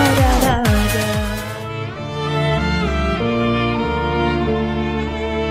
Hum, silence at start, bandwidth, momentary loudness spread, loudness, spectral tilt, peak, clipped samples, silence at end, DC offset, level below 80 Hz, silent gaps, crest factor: none; 0 s; 16 kHz; 10 LU; -19 LUFS; -5.5 dB/octave; -4 dBFS; under 0.1%; 0 s; under 0.1%; -26 dBFS; none; 14 dB